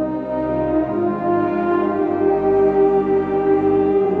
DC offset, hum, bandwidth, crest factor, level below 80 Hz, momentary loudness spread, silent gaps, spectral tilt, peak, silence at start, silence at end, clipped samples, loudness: under 0.1%; none; 4.2 kHz; 12 dB; -44 dBFS; 5 LU; none; -10 dB/octave; -6 dBFS; 0 s; 0 s; under 0.1%; -18 LUFS